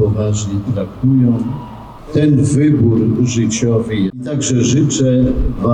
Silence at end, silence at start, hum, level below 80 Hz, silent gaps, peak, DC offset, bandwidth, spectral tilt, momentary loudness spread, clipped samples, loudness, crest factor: 0 s; 0 s; none; -30 dBFS; none; -4 dBFS; under 0.1%; 10 kHz; -6.5 dB/octave; 8 LU; under 0.1%; -14 LUFS; 10 dB